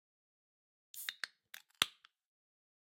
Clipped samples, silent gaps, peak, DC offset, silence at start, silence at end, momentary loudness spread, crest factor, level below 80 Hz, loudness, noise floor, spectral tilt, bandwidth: under 0.1%; none; -8 dBFS; under 0.1%; 0.95 s; 1.1 s; 19 LU; 38 dB; -84 dBFS; -40 LUFS; -60 dBFS; 1 dB/octave; 16.5 kHz